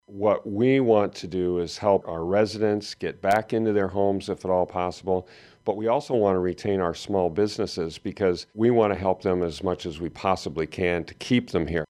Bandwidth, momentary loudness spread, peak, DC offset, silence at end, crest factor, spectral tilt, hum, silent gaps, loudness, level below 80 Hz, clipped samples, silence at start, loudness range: 12.5 kHz; 7 LU; -6 dBFS; under 0.1%; 0.05 s; 18 dB; -6.5 dB/octave; none; none; -25 LUFS; -52 dBFS; under 0.1%; 0.1 s; 2 LU